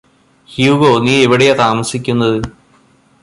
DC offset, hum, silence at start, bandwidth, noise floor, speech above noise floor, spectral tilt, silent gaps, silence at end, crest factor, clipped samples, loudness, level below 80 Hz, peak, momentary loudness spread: under 0.1%; none; 0.5 s; 11.5 kHz; -50 dBFS; 39 dB; -5 dB/octave; none; 0.75 s; 14 dB; under 0.1%; -12 LUFS; -44 dBFS; 0 dBFS; 10 LU